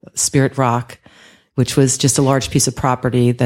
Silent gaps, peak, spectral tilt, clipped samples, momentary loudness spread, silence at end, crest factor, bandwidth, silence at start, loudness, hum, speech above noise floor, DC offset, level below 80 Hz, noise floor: none; -2 dBFS; -4.5 dB/octave; under 0.1%; 7 LU; 0 s; 16 dB; 16.5 kHz; 0.15 s; -16 LUFS; none; 32 dB; under 0.1%; -44 dBFS; -47 dBFS